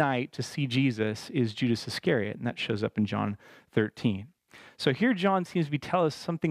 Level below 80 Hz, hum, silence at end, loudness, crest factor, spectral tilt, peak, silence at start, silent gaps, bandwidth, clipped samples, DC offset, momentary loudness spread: -68 dBFS; none; 0 s; -29 LUFS; 20 dB; -6.5 dB/octave; -10 dBFS; 0 s; none; 14.5 kHz; under 0.1%; under 0.1%; 6 LU